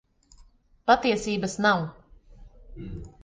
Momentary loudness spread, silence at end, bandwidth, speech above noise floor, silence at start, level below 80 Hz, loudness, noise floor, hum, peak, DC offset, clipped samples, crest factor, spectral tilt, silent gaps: 19 LU; 0.15 s; 9.8 kHz; 31 dB; 0.85 s; -50 dBFS; -24 LUFS; -56 dBFS; none; -6 dBFS; under 0.1%; under 0.1%; 22 dB; -4.5 dB/octave; none